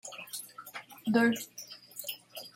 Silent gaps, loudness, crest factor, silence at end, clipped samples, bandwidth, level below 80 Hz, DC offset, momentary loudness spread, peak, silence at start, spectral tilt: none; -33 LUFS; 22 dB; 0.05 s; under 0.1%; 16.5 kHz; -78 dBFS; under 0.1%; 18 LU; -12 dBFS; 0.05 s; -3.5 dB/octave